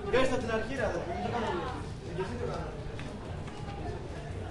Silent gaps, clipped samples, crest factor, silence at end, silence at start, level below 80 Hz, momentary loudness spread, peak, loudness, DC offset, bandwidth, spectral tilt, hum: none; under 0.1%; 20 dB; 0 s; 0 s; -46 dBFS; 10 LU; -14 dBFS; -35 LUFS; under 0.1%; 11.5 kHz; -6 dB/octave; none